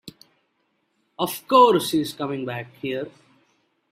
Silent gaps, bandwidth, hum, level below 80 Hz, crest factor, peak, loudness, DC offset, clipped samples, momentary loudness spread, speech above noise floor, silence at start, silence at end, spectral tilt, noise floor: none; 16 kHz; none; -68 dBFS; 22 dB; -2 dBFS; -22 LUFS; under 0.1%; under 0.1%; 16 LU; 49 dB; 0.05 s; 0.85 s; -4.5 dB/octave; -71 dBFS